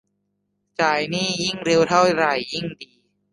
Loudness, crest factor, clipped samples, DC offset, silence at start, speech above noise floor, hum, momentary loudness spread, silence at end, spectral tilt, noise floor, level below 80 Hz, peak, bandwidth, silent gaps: -20 LUFS; 20 dB; under 0.1%; under 0.1%; 0.8 s; 53 dB; 50 Hz at -35 dBFS; 15 LU; 0.5 s; -4 dB/octave; -73 dBFS; -60 dBFS; -4 dBFS; 11.5 kHz; none